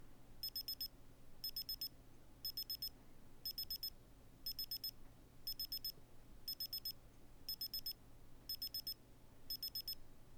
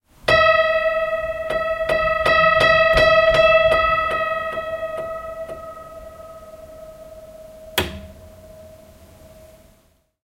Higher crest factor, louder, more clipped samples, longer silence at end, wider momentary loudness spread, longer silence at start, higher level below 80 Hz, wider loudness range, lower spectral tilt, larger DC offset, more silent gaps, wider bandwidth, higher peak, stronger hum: about the same, 16 dB vs 18 dB; second, -46 LUFS vs -17 LUFS; neither; second, 0 s vs 1.55 s; about the same, 22 LU vs 24 LU; second, 0 s vs 0.25 s; second, -62 dBFS vs -40 dBFS; second, 0 LU vs 17 LU; second, -1.5 dB/octave vs -4 dB/octave; neither; neither; first, over 20 kHz vs 16.5 kHz; second, -34 dBFS vs -2 dBFS; neither